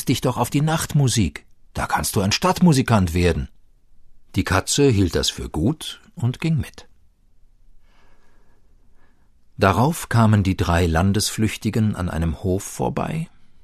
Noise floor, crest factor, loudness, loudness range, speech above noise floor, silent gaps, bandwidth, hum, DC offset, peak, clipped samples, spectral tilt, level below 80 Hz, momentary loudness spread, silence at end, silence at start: -52 dBFS; 18 dB; -20 LUFS; 8 LU; 33 dB; none; 14 kHz; none; under 0.1%; -2 dBFS; under 0.1%; -5.5 dB/octave; -38 dBFS; 11 LU; 0.1 s; 0 s